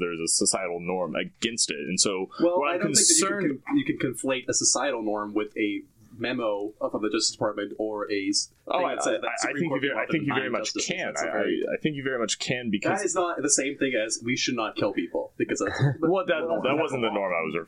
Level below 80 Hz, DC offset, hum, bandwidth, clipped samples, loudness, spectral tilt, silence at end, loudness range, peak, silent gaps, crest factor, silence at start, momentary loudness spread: -64 dBFS; under 0.1%; none; 16 kHz; under 0.1%; -26 LUFS; -3 dB/octave; 0 s; 4 LU; -6 dBFS; none; 20 dB; 0 s; 7 LU